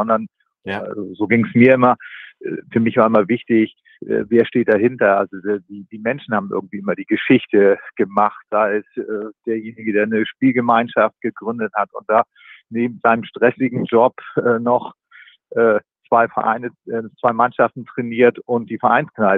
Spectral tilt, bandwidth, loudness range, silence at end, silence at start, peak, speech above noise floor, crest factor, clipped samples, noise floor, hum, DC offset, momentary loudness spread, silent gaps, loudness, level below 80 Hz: -9.5 dB/octave; 4.1 kHz; 3 LU; 0 s; 0 s; 0 dBFS; 30 dB; 18 dB; under 0.1%; -47 dBFS; none; under 0.1%; 12 LU; none; -18 LUFS; -66 dBFS